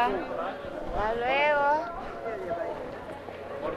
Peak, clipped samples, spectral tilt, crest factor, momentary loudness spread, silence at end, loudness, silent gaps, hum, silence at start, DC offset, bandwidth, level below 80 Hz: -12 dBFS; under 0.1%; -5.5 dB/octave; 18 dB; 15 LU; 0 s; -30 LUFS; none; none; 0 s; under 0.1%; 13 kHz; -48 dBFS